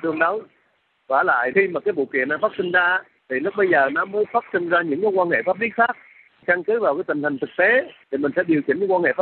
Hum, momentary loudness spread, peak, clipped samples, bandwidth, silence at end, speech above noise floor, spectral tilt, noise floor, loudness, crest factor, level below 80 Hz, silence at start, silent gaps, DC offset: none; 7 LU; -4 dBFS; under 0.1%; 4.4 kHz; 0 s; 45 dB; -3.5 dB/octave; -65 dBFS; -20 LUFS; 16 dB; -70 dBFS; 0 s; none; under 0.1%